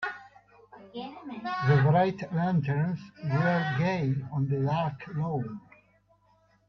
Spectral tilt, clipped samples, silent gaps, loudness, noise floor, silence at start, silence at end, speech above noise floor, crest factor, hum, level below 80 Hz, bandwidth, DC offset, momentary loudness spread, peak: -8.5 dB/octave; under 0.1%; none; -28 LUFS; -65 dBFS; 0 s; 1.1 s; 38 dB; 16 dB; none; -64 dBFS; 6.2 kHz; under 0.1%; 17 LU; -12 dBFS